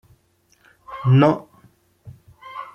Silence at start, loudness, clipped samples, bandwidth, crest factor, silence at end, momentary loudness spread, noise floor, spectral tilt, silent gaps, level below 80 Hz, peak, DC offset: 0.9 s; -18 LUFS; under 0.1%; 5.8 kHz; 20 dB; 0.1 s; 22 LU; -61 dBFS; -9 dB/octave; none; -60 dBFS; -2 dBFS; under 0.1%